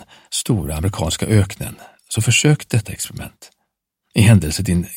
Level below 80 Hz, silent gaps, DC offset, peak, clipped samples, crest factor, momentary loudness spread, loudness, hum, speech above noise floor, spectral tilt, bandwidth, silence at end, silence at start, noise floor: -36 dBFS; none; under 0.1%; 0 dBFS; under 0.1%; 18 dB; 15 LU; -18 LUFS; none; 56 dB; -5 dB/octave; 16.5 kHz; 0 s; 0 s; -73 dBFS